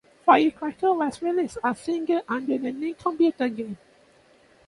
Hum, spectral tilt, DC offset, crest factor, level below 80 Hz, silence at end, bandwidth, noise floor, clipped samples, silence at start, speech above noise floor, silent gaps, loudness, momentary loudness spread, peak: none; -5.5 dB/octave; under 0.1%; 20 dB; -64 dBFS; 0.95 s; 11.5 kHz; -57 dBFS; under 0.1%; 0.25 s; 33 dB; none; -24 LUFS; 10 LU; -4 dBFS